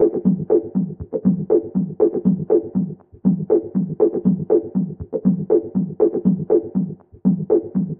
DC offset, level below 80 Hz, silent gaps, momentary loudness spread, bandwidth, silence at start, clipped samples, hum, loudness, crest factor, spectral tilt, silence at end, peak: under 0.1%; -52 dBFS; none; 7 LU; 1.9 kHz; 0 s; under 0.1%; none; -20 LUFS; 16 dB; -12.5 dB/octave; 0.05 s; -4 dBFS